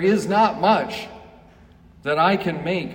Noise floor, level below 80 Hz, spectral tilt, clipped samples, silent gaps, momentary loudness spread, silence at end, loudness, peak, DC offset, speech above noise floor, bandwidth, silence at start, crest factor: -49 dBFS; -54 dBFS; -6 dB/octave; under 0.1%; none; 14 LU; 0 s; -20 LUFS; -6 dBFS; under 0.1%; 29 dB; 16 kHz; 0 s; 16 dB